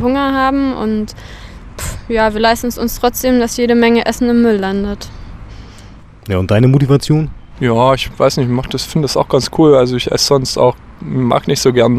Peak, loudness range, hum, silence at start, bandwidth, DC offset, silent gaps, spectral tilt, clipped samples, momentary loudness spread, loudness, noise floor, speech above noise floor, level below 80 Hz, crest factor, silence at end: 0 dBFS; 3 LU; none; 0 s; 15.5 kHz; under 0.1%; none; -5.5 dB/octave; under 0.1%; 15 LU; -13 LUFS; -36 dBFS; 24 dB; -34 dBFS; 14 dB; 0 s